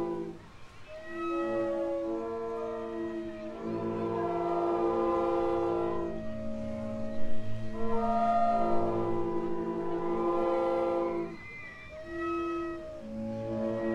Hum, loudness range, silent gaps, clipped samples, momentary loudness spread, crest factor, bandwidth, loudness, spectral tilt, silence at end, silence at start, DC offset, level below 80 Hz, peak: none; 4 LU; none; under 0.1%; 12 LU; 14 dB; 8.4 kHz; -32 LUFS; -8 dB/octave; 0 s; 0 s; under 0.1%; -52 dBFS; -16 dBFS